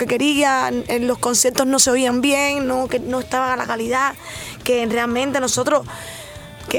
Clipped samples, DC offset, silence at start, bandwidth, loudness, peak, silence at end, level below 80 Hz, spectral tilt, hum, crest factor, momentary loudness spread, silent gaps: under 0.1%; under 0.1%; 0 s; over 20 kHz; -18 LUFS; 0 dBFS; 0 s; -48 dBFS; -2.5 dB/octave; none; 18 dB; 16 LU; none